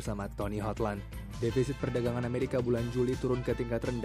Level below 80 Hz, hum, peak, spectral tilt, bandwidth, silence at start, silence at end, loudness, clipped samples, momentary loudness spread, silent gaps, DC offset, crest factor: -46 dBFS; none; -16 dBFS; -7 dB/octave; 15.5 kHz; 0 s; 0 s; -33 LUFS; under 0.1%; 5 LU; none; under 0.1%; 16 dB